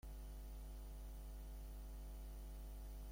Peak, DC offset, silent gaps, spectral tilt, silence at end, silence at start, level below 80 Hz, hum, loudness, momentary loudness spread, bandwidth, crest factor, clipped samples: -44 dBFS; under 0.1%; none; -5.5 dB/octave; 0 s; 0.05 s; -52 dBFS; none; -55 LUFS; 0 LU; 16.5 kHz; 8 dB; under 0.1%